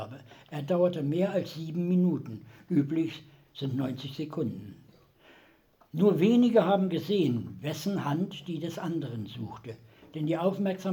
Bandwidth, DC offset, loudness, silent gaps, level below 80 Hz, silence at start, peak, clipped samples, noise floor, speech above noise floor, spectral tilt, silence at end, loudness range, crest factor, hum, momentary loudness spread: 19.5 kHz; under 0.1%; -29 LUFS; none; -72 dBFS; 0 s; -10 dBFS; under 0.1%; -62 dBFS; 34 dB; -7.5 dB/octave; 0 s; 7 LU; 20 dB; none; 20 LU